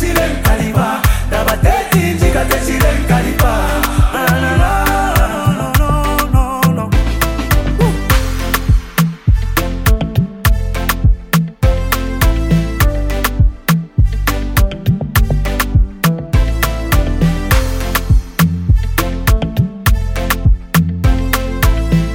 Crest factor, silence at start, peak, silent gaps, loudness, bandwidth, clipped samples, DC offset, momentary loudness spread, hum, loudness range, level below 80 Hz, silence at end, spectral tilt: 12 dB; 0 s; 0 dBFS; none; -14 LUFS; 17 kHz; under 0.1%; under 0.1%; 3 LU; none; 2 LU; -16 dBFS; 0 s; -5.5 dB/octave